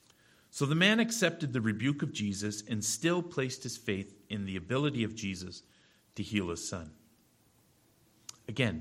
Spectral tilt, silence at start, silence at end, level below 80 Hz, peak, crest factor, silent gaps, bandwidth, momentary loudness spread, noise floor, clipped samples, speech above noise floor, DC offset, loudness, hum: -4.5 dB/octave; 0.55 s; 0 s; -66 dBFS; -12 dBFS; 22 dB; none; 16.5 kHz; 19 LU; -67 dBFS; under 0.1%; 35 dB; under 0.1%; -33 LUFS; none